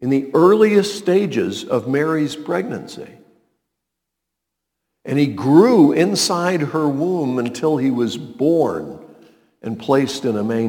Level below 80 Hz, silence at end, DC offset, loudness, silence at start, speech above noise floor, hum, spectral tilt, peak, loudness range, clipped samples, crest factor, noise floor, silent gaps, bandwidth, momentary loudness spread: -64 dBFS; 0 s; under 0.1%; -17 LUFS; 0 s; 63 dB; none; -5.5 dB/octave; 0 dBFS; 9 LU; under 0.1%; 18 dB; -80 dBFS; none; 18.5 kHz; 15 LU